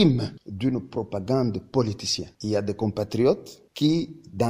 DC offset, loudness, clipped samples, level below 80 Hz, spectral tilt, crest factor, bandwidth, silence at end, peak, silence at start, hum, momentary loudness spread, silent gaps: under 0.1%; -26 LUFS; under 0.1%; -52 dBFS; -6 dB/octave; 18 dB; 16 kHz; 0 s; -6 dBFS; 0 s; none; 8 LU; none